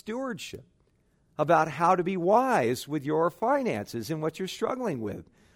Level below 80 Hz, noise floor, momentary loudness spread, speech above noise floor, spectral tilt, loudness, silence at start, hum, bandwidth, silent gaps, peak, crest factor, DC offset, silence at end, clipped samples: -66 dBFS; -67 dBFS; 15 LU; 40 dB; -6 dB/octave; -27 LUFS; 0.05 s; none; 16 kHz; none; -8 dBFS; 18 dB; under 0.1%; 0.35 s; under 0.1%